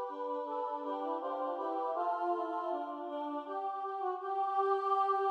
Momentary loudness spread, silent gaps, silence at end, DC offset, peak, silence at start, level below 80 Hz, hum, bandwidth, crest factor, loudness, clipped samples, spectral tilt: 8 LU; none; 0 s; under 0.1%; -20 dBFS; 0 s; under -90 dBFS; none; 8.2 kHz; 14 dB; -36 LUFS; under 0.1%; -3.5 dB/octave